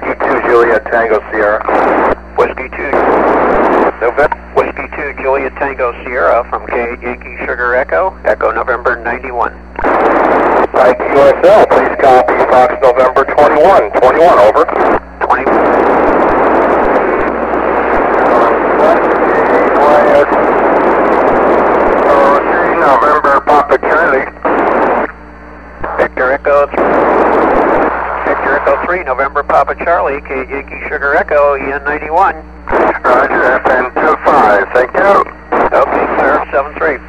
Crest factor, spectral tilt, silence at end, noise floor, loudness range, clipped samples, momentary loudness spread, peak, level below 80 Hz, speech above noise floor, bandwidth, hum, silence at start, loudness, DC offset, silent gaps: 10 dB; -6.5 dB/octave; 0 s; -31 dBFS; 6 LU; 0.7%; 8 LU; 0 dBFS; -34 dBFS; 21 dB; 11 kHz; none; 0 s; -10 LUFS; 0.7%; none